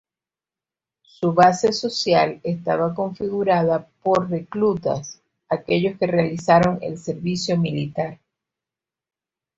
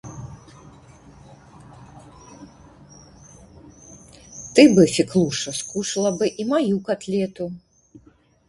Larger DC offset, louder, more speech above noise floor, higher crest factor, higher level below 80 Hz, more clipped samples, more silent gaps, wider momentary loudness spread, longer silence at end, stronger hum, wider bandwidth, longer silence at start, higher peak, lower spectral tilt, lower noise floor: neither; about the same, -21 LUFS vs -20 LUFS; first, over 70 dB vs 36 dB; about the same, 20 dB vs 24 dB; about the same, -56 dBFS vs -54 dBFS; neither; neither; second, 11 LU vs 24 LU; first, 1.45 s vs 0.9 s; neither; second, 8 kHz vs 11.5 kHz; first, 1.2 s vs 0.05 s; about the same, -2 dBFS vs 0 dBFS; about the same, -6 dB/octave vs -5 dB/octave; first, under -90 dBFS vs -55 dBFS